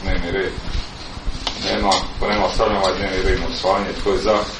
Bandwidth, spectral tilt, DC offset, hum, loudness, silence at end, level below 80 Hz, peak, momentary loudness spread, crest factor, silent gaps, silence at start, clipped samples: 10.5 kHz; -4.5 dB/octave; under 0.1%; none; -20 LUFS; 0 s; -28 dBFS; -2 dBFS; 11 LU; 18 dB; none; 0 s; under 0.1%